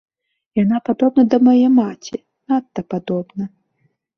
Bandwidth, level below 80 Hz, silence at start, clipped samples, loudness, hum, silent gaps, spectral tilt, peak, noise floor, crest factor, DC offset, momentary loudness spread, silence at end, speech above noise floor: 6.4 kHz; -60 dBFS; 0.55 s; under 0.1%; -17 LUFS; none; none; -8 dB/octave; -2 dBFS; -65 dBFS; 16 dB; under 0.1%; 18 LU; 0.7 s; 49 dB